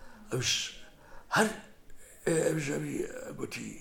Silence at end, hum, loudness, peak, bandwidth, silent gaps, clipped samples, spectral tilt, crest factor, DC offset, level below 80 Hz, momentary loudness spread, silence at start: 0 s; none; -32 LUFS; -12 dBFS; 18.5 kHz; none; under 0.1%; -3.5 dB/octave; 22 dB; under 0.1%; -56 dBFS; 11 LU; 0 s